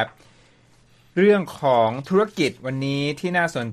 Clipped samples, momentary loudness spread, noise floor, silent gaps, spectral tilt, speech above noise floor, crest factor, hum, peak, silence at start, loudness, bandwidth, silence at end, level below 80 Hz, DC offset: under 0.1%; 8 LU; -55 dBFS; none; -6 dB/octave; 35 dB; 16 dB; none; -6 dBFS; 0 s; -21 LUFS; 14 kHz; 0 s; -62 dBFS; under 0.1%